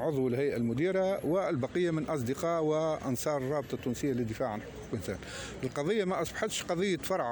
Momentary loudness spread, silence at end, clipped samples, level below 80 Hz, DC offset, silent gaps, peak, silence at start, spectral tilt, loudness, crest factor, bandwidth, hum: 8 LU; 0 s; under 0.1%; -56 dBFS; under 0.1%; none; -18 dBFS; 0 s; -5.5 dB/octave; -32 LUFS; 14 dB; over 20 kHz; none